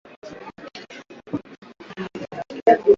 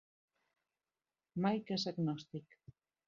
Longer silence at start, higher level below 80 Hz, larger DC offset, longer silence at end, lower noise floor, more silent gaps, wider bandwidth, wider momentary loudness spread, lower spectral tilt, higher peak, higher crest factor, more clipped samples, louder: second, 0.25 s vs 1.35 s; first, -64 dBFS vs -80 dBFS; neither; second, 0 s vs 0.65 s; second, -42 dBFS vs under -90 dBFS; first, 1.58-1.62 s vs none; about the same, 7 kHz vs 7.2 kHz; first, 22 LU vs 13 LU; about the same, -6.5 dB/octave vs -5.5 dB/octave; first, -2 dBFS vs -20 dBFS; about the same, 20 dB vs 22 dB; neither; first, -25 LUFS vs -38 LUFS